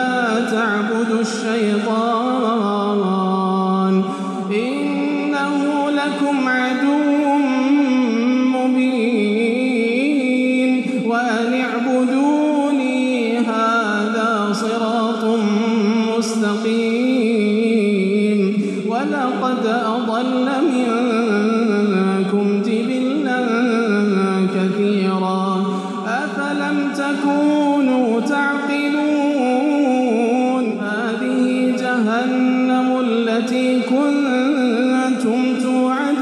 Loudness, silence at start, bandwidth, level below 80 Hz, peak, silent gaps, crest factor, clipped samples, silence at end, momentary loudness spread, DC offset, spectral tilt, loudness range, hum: -18 LUFS; 0 s; 11 kHz; -80 dBFS; -6 dBFS; none; 10 dB; under 0.1%; 0 s; 3 LU; under 0.1%; -6 dB/octave; 2 LU; none